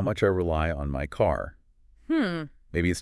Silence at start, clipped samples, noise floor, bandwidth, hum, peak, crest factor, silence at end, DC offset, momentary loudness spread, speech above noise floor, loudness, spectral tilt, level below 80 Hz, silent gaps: 0 s; under 0.1%; -57 dBFS; 12 kHz; none; -10 dBFS; 16 dB; 0 s; under 0.1%; 8 LU; 31 dB; -27 LUFS; -6.5 dB/octave; -40 dBFS; none